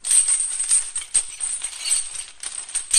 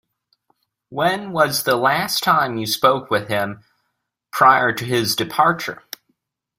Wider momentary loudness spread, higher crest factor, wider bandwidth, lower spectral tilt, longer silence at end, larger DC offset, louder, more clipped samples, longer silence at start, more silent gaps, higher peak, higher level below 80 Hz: about the same, 14 LU vs 15 LU; about the same, 20 dB vs 18 dB; second, 13.5 kHz vs 16 kHz; second, 4 dB/octave vs -3.5 dB/octave; second, 0 s vs 0.85 s; neither; about the same, -20 LUFS vs -18 LUFS; neither; second, 0.05 s vs 0.9 s; neither; about the same, -2 dBFS vs -2 dBFS; first, -54 dBFS vs -60 dBFS